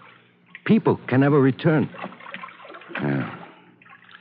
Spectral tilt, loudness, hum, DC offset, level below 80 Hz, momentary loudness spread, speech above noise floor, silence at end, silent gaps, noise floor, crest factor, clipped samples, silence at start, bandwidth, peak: -7 dB/octave; -21 LUFS; 60 Hz at -50 dBFS; under 0.1%; -72 dBFS; 19 LU; 33 dB; 0.75 s; none; -52 dBFS; 18 dB; under 0.1%; 0.65 s; 5 kHz; -6 dBFS